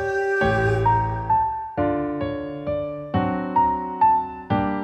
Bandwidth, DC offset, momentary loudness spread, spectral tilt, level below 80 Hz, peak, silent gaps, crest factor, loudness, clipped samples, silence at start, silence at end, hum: 8.6 kHz; under 0.1%; 8 LU; -8 dB/octave; -40 dBFS; -8 dBFS; none; 14 dB; -22 LUFS; under 0.1%; 0 s; 0 s; none